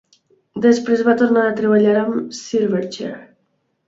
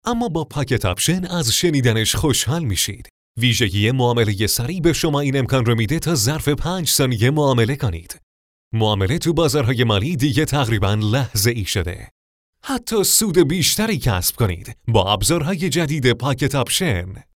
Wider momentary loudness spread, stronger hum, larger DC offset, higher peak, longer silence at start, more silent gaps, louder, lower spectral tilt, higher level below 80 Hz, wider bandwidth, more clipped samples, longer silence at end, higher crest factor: first, 14 LU vs 7 LU; neither; neither; about the same, -2 dBFS vs -2 dBFS; first, 0.55 s vs 0.05 s; second, none vs 3.10-3.35 s, 8.23-8.71 s, 12.11-12.53 s; about the same, -17 LUFS vs -18 LUFS; first, -6 dB/octave vs -4.5 dB/octave; second, -64 dBFS vs -38 dBFS; second, 7.8 kHz vs 19.5 kHz; neither; first, 0.65 s vs 0.15 s; about the same, 16 dB vs 16 dB